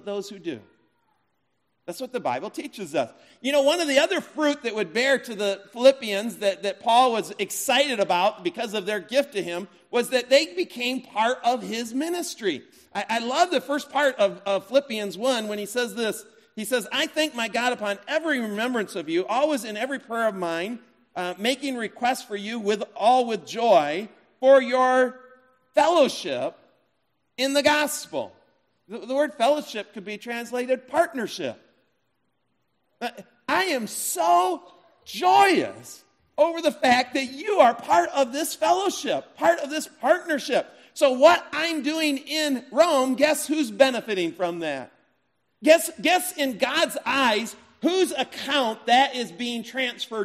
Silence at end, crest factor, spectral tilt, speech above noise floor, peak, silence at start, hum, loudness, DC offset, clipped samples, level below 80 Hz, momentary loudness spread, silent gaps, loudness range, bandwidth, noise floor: 0 s; 20 dB; -2.5 dB/octave; 51 dB; -4 dBFS; 0.05 s; none; -23 LUFS; under 0.1%; under 0.1%; -76 dBFS; 13 LU; none; 5 LU; 15.5 kHz; -75 dBFS